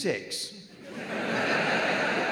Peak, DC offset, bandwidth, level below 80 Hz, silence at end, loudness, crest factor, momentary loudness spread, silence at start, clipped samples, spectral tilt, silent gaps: -12 dBFS; under 0.1%; over 20 kHz; -76 dBFS; 0 s; -28 LUFS; 16 dB; 15 LU; 0 s; under 0.1%; -3.5 dB/octave; none